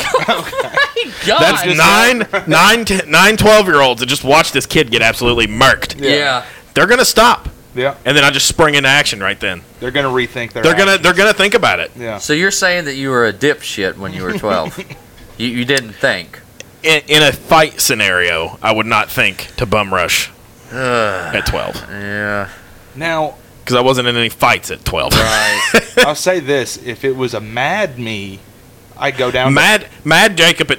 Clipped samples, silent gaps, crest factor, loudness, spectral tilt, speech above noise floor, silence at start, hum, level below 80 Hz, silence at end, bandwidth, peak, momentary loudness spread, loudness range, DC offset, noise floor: under 0.1%; none; 14 dB; -12 LUFS; -3 dB/octave; 27 dB; 0 s; none; -36 dBFS; 0 s; 17 kHz; 0 dBFS; 12 LU; 7 LU; under 0.1%; -40 dBFS